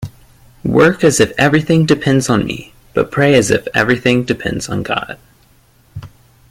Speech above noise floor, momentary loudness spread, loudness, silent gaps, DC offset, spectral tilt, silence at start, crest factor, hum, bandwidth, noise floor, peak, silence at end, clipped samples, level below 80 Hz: 37 dB; 18 LU; -14 LUFS; none; under 0.1%; -5 dB/octave; 0 s; 14 dB; none; 16.5 kHz; -50 dBFS; 0 dBFS; 0.4 s; under 0.1%; -42 dBFS